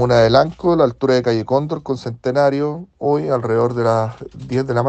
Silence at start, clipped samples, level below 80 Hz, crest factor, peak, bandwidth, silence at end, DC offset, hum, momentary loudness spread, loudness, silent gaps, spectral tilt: 0 s; under 0.1%; -46 dBFS; 16 dB; 0 dBFS; 8.6 kHz; 0 s; under 0.1%; none; 10 LU; -17 LUFS; none; -7 dB/octave